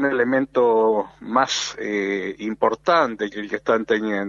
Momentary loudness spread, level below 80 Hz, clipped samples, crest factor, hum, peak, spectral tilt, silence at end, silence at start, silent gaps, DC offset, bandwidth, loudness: 8 LU; -60 dBFS; under 0.1%; 18 dB; none; -4 dBFS; -4 dB/octave; 0 s; 0 s; none; under 0.1%; 7.6 kHz; -21 LUFS